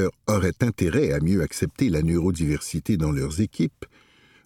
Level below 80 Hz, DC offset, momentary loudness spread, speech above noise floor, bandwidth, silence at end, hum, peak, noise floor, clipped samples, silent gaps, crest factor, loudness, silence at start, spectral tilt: -40 dBFS; under 0.1%; 5 LU; 33 dB; 16.5 kHz; 0.6 s; none; -6 dBFS; -56 dBFS; under 0.1%; none; 16 dB; -24 LUFS; 0 s; -6.5 dB/octave